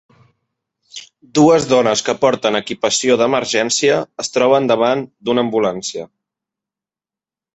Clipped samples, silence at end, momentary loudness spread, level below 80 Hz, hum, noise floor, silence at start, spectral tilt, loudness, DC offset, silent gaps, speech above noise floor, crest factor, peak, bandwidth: under 0.1%; 1.5 s; 13 LU; -58 dBFS; none; -90 dBFS; 0.95 s; -3.5 dB/octave; -15 LUFS; under 0.1%; none; 75 dB; 16 dB; -2 dBFS; 8.2 kHz